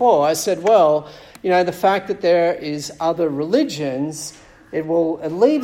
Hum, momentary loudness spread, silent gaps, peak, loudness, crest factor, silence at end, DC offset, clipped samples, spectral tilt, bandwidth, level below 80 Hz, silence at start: none; 12 LU; none; -2 dBFS; -19 LUFS; 16 dB; 0 s; under 0.1%; under 0.1%; -5 dB/octave; 16.5 kHz; -58 dBFS; 0 s